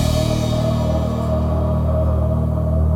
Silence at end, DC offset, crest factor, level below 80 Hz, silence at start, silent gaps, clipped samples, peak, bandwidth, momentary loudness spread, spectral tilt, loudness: 0 s; under 0.1%; 12 dB; -22 dBFS; 0 s; none; under 0.1%; -6 dBFS; 15.5 kHz; 1 LU; -7.5 dB/octave; -19 LUFS